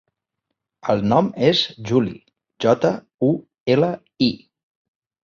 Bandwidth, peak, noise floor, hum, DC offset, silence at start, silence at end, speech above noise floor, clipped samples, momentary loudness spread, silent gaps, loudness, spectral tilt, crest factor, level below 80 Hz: 7.2 kHz; -2 dBFS; -80 dBFS; none; under 0.1%; 0.85 s; 0.85 s; 61 dB; under 0.1%; 7 LU; 3.14-3.18 s, 3.60-3.66 s; -20 LUFS; -6.5 dB/octave; 20 dB; -56 dBFS